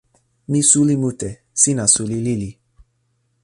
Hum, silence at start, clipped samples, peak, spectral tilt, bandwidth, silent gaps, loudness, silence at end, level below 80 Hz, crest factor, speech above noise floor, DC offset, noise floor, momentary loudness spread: none; 0.5 s; under 0.1%; 0 dBFS; -4 dB/octave; 11.5 kHz; none; -16 LUFS; 0.9 s; -50 dBFS; 20 dB; 49 dB; under 0.1%; -66 dBFS; 13 LU